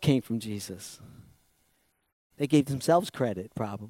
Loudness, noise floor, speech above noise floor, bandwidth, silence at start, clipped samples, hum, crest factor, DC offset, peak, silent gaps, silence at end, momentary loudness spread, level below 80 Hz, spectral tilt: -29 LUFS; -72 dBFS; 43 dB; 16 kHz; 0 s; under 0.1%; none; 20 dB; under 0.1%; -10 dBFS; 2.12-2.30 s; 0 s; 16 LU; -64 dBFS; -6 dB/octave